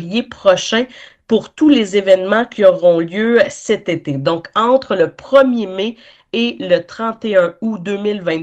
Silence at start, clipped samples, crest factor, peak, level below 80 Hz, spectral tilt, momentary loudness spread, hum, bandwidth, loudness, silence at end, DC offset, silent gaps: 0 s; under 0.1%; 14 dB; 0 dBFS; -56 dBFS; -5 dB/octave; 9 LU; none; 8.6 kHz; -15 LUFS; 0 s; under 0.1%; none